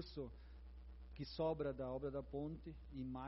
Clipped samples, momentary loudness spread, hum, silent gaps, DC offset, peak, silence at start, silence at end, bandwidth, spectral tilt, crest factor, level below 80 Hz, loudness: under 0.1%; 17 LU; none; none; under 0.1%; -30 dBFS; 0 s; 0 s; 5.8 kHz; -6.5 dB/octave; 16 dB; -58 dBFS; -47 LUFS